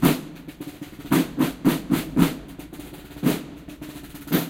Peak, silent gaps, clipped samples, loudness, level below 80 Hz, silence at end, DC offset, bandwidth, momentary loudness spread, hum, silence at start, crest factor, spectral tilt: -4 dBFS; none; under 0.1%; -24 LUFS; -48 dBFS; 0 s; under 0.1%; 17 kHz; 17 LU; none; 0 s; 22 dB; -5.5 dB/octave